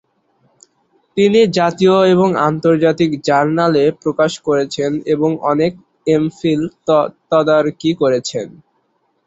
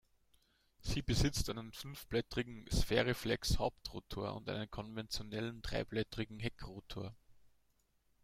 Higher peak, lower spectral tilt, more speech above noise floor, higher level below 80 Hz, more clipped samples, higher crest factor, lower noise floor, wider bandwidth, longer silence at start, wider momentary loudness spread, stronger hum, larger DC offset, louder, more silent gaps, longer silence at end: first, 0 dBFS vs -18 dBFS; first, -6 dB/octave vs -4.5 dB/octave; first, 49 dB vs 37 dB; second, -56 dBFS vs -48 dBFS; neither; second, 14 dB vs 22 dB; second, -63 dBFS vs -76 dBFS; second, 8 kHz vs 16 kHz; first, 1.15 s vs 0.8 s; second, 7 LU vs 13 LU; neither; neither; first, -15 LUFS vs -40 LUFS; neither; about the same, 0.75 s vs 0.75 s